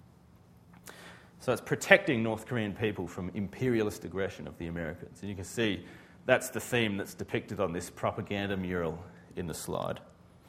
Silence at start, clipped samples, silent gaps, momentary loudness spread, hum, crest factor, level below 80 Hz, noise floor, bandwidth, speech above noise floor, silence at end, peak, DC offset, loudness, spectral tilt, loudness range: 0.7 s; under 0.1%; none; 15 LU; none; 30 dB; -60 dBFS; -58 dBFS; 16 kHz; 26 dB; 0.4 s; -4 dBFS; under 0.1%; -32 LUFS; -5 dB/octave; 5 LU